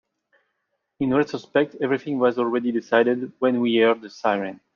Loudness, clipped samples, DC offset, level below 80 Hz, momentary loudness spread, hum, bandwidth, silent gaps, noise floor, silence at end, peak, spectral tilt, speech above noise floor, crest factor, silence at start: -22 LUFS; under 0.1%; under 0.1%; -68 dBFS; 5 LU; none; 7 kHz; none; -76 dBFS; 0.2 s; -6 dBFS; -6.5 dB/octave; 55 dB; 18 dB; 1 s